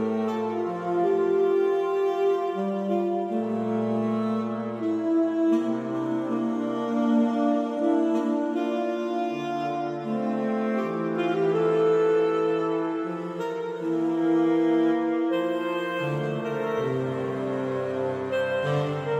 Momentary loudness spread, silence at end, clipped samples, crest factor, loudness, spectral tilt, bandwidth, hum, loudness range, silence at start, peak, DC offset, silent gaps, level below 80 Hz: 6 LU; 0 s; under 0.1%; 14 dB; -26 LUFS; -7.5 dB/octave; 8.4 kHz; none; 3 LU; 0 s; -12 dBFS; under 0.1%; none; -72 dBFS